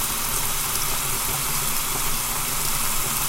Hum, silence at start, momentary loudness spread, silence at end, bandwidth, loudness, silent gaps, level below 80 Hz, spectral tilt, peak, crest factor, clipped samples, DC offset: none; 0 s; 1 LU; 0 s; 17 kHz; -22 LUFS; none; -32 dBFS; -1 dB/octave; -6 dBFS; 16 dB; under 0.1%; under 0.1%